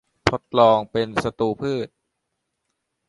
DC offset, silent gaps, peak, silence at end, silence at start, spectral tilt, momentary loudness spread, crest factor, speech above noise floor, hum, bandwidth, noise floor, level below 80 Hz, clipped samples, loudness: under 0.1%; none; 0 dBFS; 1.25 s; 0.25 s; -6 dB/octave; 11 LU; 22 dB; 57 dB; none; 11.5 kHz; -78 dBFS; -50 dBFS; under 0.1%; -21 LUFS